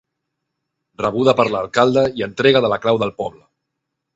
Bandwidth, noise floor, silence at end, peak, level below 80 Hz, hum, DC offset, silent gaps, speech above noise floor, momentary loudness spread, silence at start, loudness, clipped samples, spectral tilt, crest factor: 8 kHz; -78 dBFS; 0.85 s; 0 dBFS; -54 dBFS; none; under 0.1%; none; 61 dB; 9 LU; 1 s; -17 LUFS; under 0.1%; -6 dB/octave; 18 dB